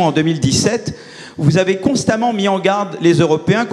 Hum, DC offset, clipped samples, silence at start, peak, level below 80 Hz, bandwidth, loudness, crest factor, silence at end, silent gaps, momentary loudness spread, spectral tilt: none; under 0.1%; under 0.1%; 0 s; 0 dBFS; -46 dBFS; 12.5 kHz; -15 LUFS; 14 dB; 0 s; none; 7 LU; -5.5 dB/octave